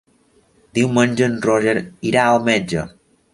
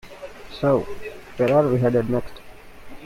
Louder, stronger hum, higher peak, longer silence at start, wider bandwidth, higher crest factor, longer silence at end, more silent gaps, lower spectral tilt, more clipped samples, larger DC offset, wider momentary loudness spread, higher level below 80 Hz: first, -18 LUFS vs -21 LUFS; neither; first, -2 dBFS vs -6 dBFS; first, 0.75 s vs 0.05 s; second, 11.5 kHz vs 16 kHz; about the same, 18 dB vs 16 dB; first, 0.45 s vs 0 s; neither; second, -5.5 dB/octave vs -8 dB/octave; neither; neither; second, 10 LU vs 21 LU; second, -52 dBFS vs -46 dBFS